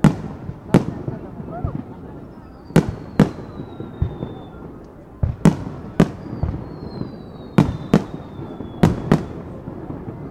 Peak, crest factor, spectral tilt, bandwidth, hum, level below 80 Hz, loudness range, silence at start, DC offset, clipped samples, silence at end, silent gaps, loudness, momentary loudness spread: 0 dBFS; 22 dB; -8 dB/octave; 13.5 kHz; none; -38 dBFS; 3 LU; 0 s; under 0.1%; under 0.1%; 0 s; none; -22 LUFS; 18 LU